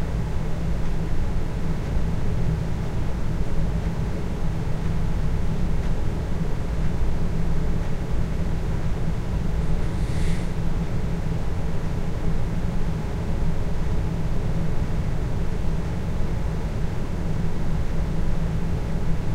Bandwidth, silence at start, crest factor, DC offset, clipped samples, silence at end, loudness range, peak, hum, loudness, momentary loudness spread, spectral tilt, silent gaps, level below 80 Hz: 9.4 kHz; 0 s; 12 dB; under 0.1%; under 0.1%; 0 s; 1 LU; -10 dBFS; none; -28 LUFS; 2 LU; -7.5 dB/octave; none; -24 dBFS